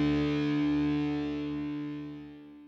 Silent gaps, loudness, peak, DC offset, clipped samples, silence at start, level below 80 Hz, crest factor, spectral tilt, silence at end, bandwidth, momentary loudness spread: none; -31 LUFS; -20 dBFS; under 0.1%; under 0.1%; 0 s; -52 dBFS; 10 dB; -8 dB/octave; 0 s; 6.4 kHz; 14 LU